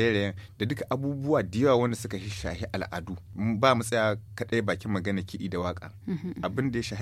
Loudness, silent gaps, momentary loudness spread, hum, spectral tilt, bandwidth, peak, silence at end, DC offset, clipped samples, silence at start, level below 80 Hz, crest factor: -29 LUFS; none; 11 LU; none; -6 dB/octave; 15.5 kHz; -8 dBFS; 0 s; under 0.1%; under 0.1%; 0 s; -52 dBFS; 20 dB